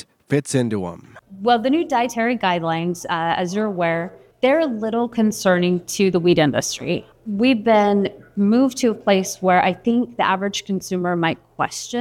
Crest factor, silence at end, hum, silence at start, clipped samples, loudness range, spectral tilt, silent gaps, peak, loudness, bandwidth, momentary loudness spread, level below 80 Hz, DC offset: 16 dB; 0 s; none; 0.3 s; under 0.1%; 3 LU; -5 dB/octave; none; -4 dBFS; -20 LUFS; 16 kHz; 9 LU; -58 dBFS; under 0.1%